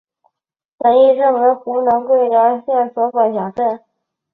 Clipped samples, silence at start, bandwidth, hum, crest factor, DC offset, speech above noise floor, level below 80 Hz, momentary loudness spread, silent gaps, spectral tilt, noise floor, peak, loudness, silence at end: under 0.1%; 0.8 s; 4.1 kHz; none; 14 dB; under 0.1%; 51 dB; -62 dBFS; 8 LU; none; -8.5 dB/octave; -65 dBFS; -2 dBFS; -15 LUFS; 0.55 s